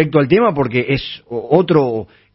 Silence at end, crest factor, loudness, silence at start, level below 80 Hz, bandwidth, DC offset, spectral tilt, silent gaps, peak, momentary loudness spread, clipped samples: 0.3 s; 16 dB; -15 LUFS; 0 s; -46 dBFS; 5.8 kHz; under 0.1%; -11.5 dB/octave; none; 0 dBFS; 12 LU; under 0.1%